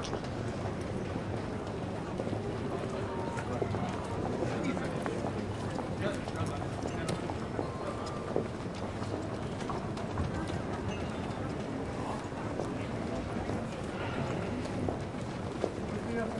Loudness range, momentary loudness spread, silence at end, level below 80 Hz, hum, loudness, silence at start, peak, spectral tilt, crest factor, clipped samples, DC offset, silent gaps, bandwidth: 2 LU; 3 LU; 0 s; -52 dBFS; none; -36 LUFS; 0 s; -14 dBFS; -6.5 dB/octave; 22 dB; under 0.1%; under 0.1%; none; 11.5 kHz